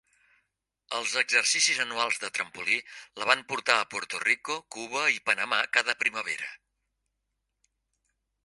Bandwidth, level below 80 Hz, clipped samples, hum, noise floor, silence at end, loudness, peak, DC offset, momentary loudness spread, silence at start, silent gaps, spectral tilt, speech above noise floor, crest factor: 11.5 kHz; -78 dBFS; under 0.1%; none; -82 dBFS; 1.9 s; -26 LUFS; -2 dBFS; under 0.1%; 11 LU; 0.9 s; none; 0.5 dB/octave; 53 dB; 28 dB